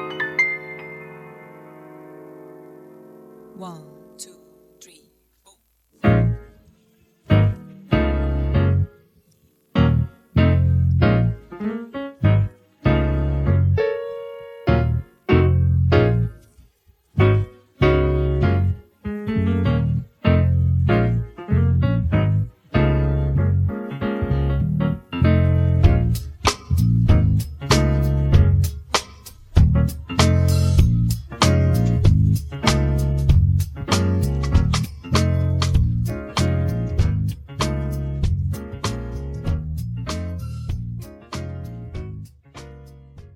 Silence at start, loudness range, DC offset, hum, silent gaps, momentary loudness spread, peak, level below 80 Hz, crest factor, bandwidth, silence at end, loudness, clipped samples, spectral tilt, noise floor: 0 s; 9 LU; under 0.1%; none; none; 15 LU; 0 dBFS; -28 dBFS; 20 dB; 16 kHz; 0.1 s; -20 LUFS; under 0.1%; -6.5 dB/octave; -61 dBFS